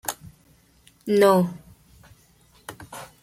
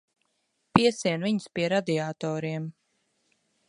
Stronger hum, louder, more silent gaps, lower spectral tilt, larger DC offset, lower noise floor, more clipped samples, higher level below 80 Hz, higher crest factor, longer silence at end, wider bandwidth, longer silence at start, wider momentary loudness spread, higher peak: neither; first, -21 LUFS vs -27 LUFS; neither; about the same, -5.5 dB/octave vs -5.5 dB/octave; neither; second, -58 dBFS vs -75 dBFS; neither; about the same, -60 dBFS vs -60 dBFS; second, 20 dB vs 28 dB; second, 0.2 s vs 0.95 s; first, 16.5 kHz vs 11 kHz; second, 0.05 s vs 0.75 s; first, 25 LU vs 10 LU; second, -6 dBFS vs 0 dBFS